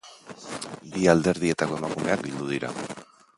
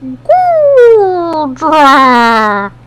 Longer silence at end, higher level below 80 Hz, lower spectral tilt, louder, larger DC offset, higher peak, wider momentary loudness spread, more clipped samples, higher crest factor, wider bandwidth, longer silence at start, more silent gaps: first, 0.35 s vs 0.2 s; second, -56 dBFS vs -44 dBFS; about the same, -5.5 dB/octave vs -4.5 dB/octave; second, -26 LUFS vs -7 LUFS; neither; about the same, -2 dBFS vs 0 dBFS; first, 17 LU vs 9 LU; second, under 0.1% vs 6%; first, 24 dB vs 8 dB; second, 11.5 kHz vs 14.5 kHz; about the same, 0.05 s vs 0 s; neither